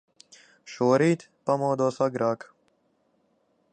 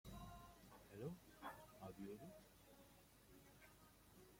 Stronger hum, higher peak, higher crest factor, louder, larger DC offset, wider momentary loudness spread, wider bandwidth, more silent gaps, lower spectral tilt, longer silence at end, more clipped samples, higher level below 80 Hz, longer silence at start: neither; first, -8 dBFS vs -40 dBFS; about the same, 20 dB vs 20 dB; first, -25 LUFS vs -60 LUFS; neither; second, 9 LU vs 13 LU; second, 9.2 kHz vs 16.5 kHz; neither; about the same, -6.5 dB/octave vs -5.5 dB/octave; first, 1.35 s vs 0 s; neither; about the same, -76 dBFS vs -72 dBFS; first, 0.65 s vs 0.05 s